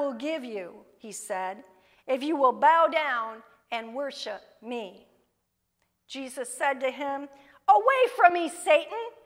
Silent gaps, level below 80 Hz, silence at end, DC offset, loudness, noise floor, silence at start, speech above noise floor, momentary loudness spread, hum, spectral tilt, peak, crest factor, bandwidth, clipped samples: none; -80 dBFS; 0.15 s; under 0.1%; -26 LUFS; -78 dBFS; 0 s; 51 dB; 20 LU; none; -2 dB/octave; -4 dBFS; 22 dB; 16 kHz; under 0.1%